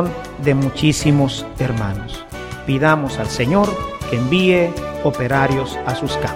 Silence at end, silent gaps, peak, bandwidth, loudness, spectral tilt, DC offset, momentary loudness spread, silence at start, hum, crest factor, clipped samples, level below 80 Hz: 0 s; none; -2 dBFS; 16 kHz; -18 LUFS; -6 dB/octave; under 0.1%; 10 LU; 0 s; none; 16 dB; under 0.1%; -36 dBFS